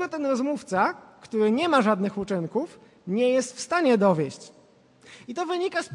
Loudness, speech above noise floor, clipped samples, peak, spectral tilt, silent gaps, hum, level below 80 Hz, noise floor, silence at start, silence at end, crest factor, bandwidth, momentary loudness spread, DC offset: -25 LUFS; 32 dB; under 0.1%; -8 dBFS; -5.5 dB/octave; none; none; -68 dBFS; -56 dBFS; 0 s; 0 s; 18 dB; 11.5 kHz; 16 LU; under 0.1%